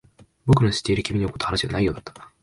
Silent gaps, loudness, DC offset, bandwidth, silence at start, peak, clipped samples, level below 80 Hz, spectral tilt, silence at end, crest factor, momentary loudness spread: none; -22 LUFS; under 0.1%; 11.5 kHz; 0.45 s; -4 dBFS; under 0.1%; -42 dBFS; -6 dB/octave; 0.15 s; 18 dB; 13 LU